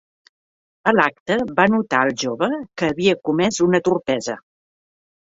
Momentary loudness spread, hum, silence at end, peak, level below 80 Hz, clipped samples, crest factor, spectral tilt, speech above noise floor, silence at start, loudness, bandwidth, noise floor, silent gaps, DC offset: 6 LU; none; 1 s; -2 dBFS; -58 dBFS; under 0.1%; 20 dB; -4.5 dB/octave; over 71 dB; 0.85 s; -19 LUFS; 8 kHz; under -90 dBFS; 1.20-1.26 s; under 0.1%